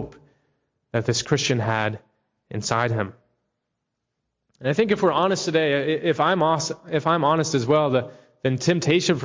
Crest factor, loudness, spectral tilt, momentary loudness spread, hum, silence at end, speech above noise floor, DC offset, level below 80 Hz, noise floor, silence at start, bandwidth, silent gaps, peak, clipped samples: 16 dB; -22 LUFS; -5 dB/octave; 9 LU; none; 0 s; 58 dB; under 0.1%; -58 dBFS; -80 dBFS; 0 s; 7.6 kHz; none; -6 dBFS; under 0.1%